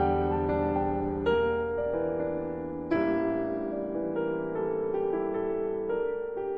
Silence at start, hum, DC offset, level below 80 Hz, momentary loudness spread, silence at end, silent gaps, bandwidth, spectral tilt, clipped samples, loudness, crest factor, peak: 0 s; none; under 0.1%; -48 dBFS; 5 LU; 0 s; none; 5.6 kHz; -10 dB/octave; under 0.1%; -30 LUFS; 14 dB; -14 dBFS